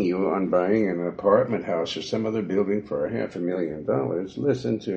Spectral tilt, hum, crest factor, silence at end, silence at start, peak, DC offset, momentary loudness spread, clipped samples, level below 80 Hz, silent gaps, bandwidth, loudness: -7 dB/octave; none; 18 dB; 0 s; 0 s; -6 dBFS; under 0.1%; 7 LU; under 0.1%; -58 dBFS; none; 8 kHz; -25 LUFS